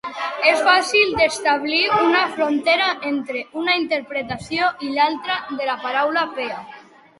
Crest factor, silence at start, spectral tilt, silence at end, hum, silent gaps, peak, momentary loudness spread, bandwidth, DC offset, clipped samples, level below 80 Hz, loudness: 18 dB; 0.05 s; -3 dB/octave; 0.4 s; none; none; -2 dBFS; 11 LU; 11.5 kHz; under 0.1%; under 0.1%; -56 dBFS; -19 LUFS